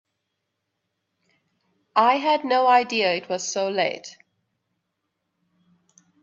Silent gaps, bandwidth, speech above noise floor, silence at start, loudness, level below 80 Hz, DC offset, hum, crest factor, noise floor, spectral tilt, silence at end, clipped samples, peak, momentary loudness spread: none; 7.8 kHz; 58 dB; 1.95 s; -21 LUFS; -78 dBFS; under 0.1%; none; 20 dB; -79 dBFS; -2.5 dB/octave; 2.1 s; under 0.1%; -4 dBFS; 9 LU